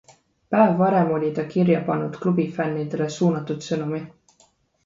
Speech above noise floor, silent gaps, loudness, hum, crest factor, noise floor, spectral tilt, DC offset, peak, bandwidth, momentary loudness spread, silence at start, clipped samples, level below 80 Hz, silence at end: 39 dB; none; -22 LUFS; none; 18 dB; -61 dBFS; -7.5 dB/octave; under 0.1%; -4 dBFS; 7.8 kHz; 9 LU; 0.5 s; under 0.1%; -64 dBFS; 0.75 s